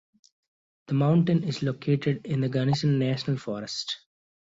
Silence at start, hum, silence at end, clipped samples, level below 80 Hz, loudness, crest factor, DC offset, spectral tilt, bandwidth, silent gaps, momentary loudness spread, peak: 0.9 s; none; 0.6 s; under 0.1%; -64 dBFS; -26 LUFS; 16 dB; under 0.1%; -7 dB/octave; 7.8 kHz; none; 9 LU; -12 dBFS